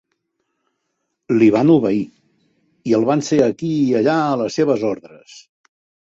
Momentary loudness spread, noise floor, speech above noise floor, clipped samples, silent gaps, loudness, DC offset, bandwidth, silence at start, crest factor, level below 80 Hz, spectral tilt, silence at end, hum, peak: 10 LU; -74 dBFS; 58 dB; under 0.1%; none; -17 LUFS; under 0.1%; 7.8 kHz; 1.3 s; 16 dB; -60 dBFS; -6.5 dB/octave; 0.65 s; none; -2 dBFS